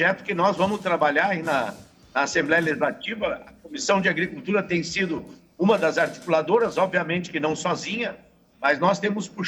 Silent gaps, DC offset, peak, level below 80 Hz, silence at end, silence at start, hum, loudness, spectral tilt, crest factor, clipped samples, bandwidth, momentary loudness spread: none; under 0.1%; -8 dBFS; -60 dBFS; 0 s; 0 s; none; -23 LUFS; -4.5 dB/octave; 16 dB; under 0.1%; 19 kHz; 8 LU